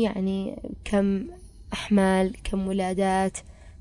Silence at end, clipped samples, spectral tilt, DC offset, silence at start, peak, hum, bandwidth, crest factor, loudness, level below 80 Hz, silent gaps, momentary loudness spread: 0.05 s; under 0.1%; -6 dB/octave; under 0.1%; 0 s; -12 dBFS; none; 11.5 kHz; 14 dB; -26 LUFS; -44 dBFS; none; 13 LU